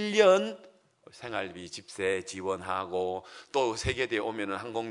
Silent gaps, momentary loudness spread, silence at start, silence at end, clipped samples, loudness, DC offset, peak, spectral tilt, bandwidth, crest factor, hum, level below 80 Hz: none; 16 LU; 0 s; 0 s; under 0.1%; -30 LUFS; under 0.1%; -8 dBFS; -4 dB/octave; 11 kHz; 22 dB; none; -58 dBFS